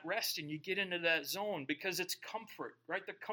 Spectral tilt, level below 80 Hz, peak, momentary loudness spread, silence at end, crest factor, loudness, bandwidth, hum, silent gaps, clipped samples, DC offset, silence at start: -2.5 dB/octave; under -90 dBFS; -20 dBFS; 12 LU; 0 s; 20 dB; -38 LUFS; 17.5 kHz; none; none; under 0.1%; under 0.1%; 0 s